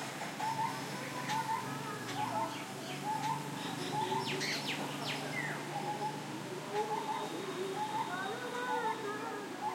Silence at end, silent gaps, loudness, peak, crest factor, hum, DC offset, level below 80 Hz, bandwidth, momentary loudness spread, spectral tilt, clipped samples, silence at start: 0 s; none; -38 LUFS; -24 dBFS; 14 dB; none; under 0.1%; -82 dBFS; 16.5 kHz; 5 LU; -3.5 dB/octave; under 0.1%; 0 s